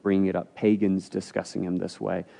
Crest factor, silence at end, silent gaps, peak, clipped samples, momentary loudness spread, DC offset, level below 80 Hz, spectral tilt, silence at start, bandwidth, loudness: 16 dB; 0.15 s; none; -10 dBFS; under 0.1%; 8 LU; under 0.1%; -72 dBFS; -7 dB/octave; 0.05 s; 10.5 kHz; -27 LUFS